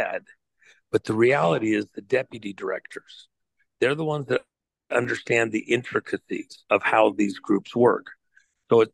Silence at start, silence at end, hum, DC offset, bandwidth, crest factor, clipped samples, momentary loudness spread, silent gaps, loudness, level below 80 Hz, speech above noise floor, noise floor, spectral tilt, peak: 0 s; 0.05 s; none; under 0.1%; 11.5 kHz; 20 dB; under 0.1%; 13 LU; none; -24 LUFS; -68 dBFS; 50 dB; -74 dBFS; -6 dB/octave; -4 dBFS